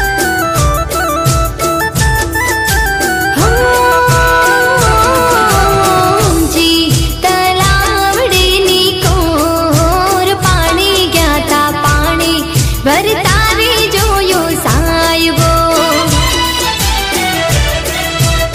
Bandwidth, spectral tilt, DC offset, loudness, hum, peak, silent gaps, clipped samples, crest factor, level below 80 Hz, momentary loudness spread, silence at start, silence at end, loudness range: 16 kHz; -3.5 dB/octave; under 0.1%; -10 LUFS; none; 0 dBFS; none; under 0.1%; 10 dB; -20 dBFS; 4 LU; 0 s; 0 s; 2 LU